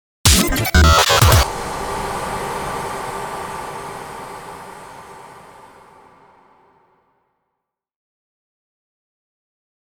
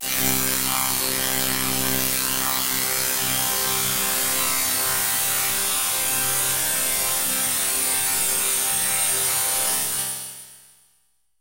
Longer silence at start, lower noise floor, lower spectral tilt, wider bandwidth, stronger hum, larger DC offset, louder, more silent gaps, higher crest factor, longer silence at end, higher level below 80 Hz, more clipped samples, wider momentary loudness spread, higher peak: first, 0.25 s vs 0 s; first, -79 dBFS vs -67 dBFS; first, -3.5 dB/octave vs -0.5 dB/octave; first, over 20 kHz vs 16 kHz; neither; neither; first, -16 LUFS vs -20 LUFS; neither; about the same, 20 dB vs 20 dB; first, 4.3 s vs 0.8 s; first, -28 dBFS vs -52 dBFS; neither; first, 25 LU vs 2 LU; first, 0 dBFS vs -4 dBFS